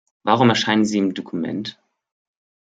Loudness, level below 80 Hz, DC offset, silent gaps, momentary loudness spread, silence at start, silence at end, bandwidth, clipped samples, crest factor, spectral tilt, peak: -19 LUFS; -64 dBFS; under 0.1%; none; 12 LU; 0.25 s; 0.9 s; 9 kHz; under 0.1%; 20 dB; -5 dB/octave; -2 dBFS